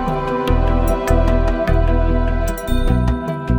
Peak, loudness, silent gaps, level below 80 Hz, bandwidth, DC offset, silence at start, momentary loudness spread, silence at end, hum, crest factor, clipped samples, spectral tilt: -2 dBFS; -18 LUFS; none; -18 dBFS; 18 kHz; under 0.1%; 0 s; 4 LU; 0 s; none; 14 dB; under 0.1%; -7.5 dB/octave